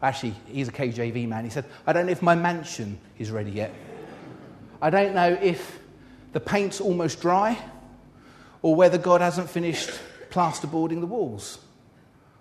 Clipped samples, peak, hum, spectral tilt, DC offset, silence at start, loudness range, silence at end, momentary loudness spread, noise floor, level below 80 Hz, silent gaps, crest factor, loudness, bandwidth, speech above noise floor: under 0.1%; -4 dBFS; none; -5.5 dB/octave; under 0.1%; 0 s; 4 LU; 0.8 s; 19 LU; -55 dBFS; -60 dBFS; none; 20 dB; -25 LUFS; 13.5 kHz; 31 dB